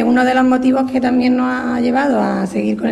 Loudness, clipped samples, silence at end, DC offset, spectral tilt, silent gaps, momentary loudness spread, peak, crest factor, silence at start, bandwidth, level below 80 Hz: -15 LUFS; under 0.1%; 0 s; under 0.1%; -6.5 dB/octave; none; 5 LU; -4 dBFS; 10 dB; 0 s; 11 kHz; -50 dBFS